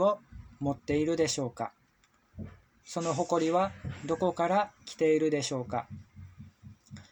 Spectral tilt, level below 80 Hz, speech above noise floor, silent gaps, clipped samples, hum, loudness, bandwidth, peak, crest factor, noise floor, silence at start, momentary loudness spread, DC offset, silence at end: -5 dB/octave; -60 dBFS; 38 dB; none; under 0.1%; none; -31 LUFS; over 20 kHz; -14 dBFS; 18 dB; -68 dBFS; 0 s; 20 LU; under 0.1%; 0.1 s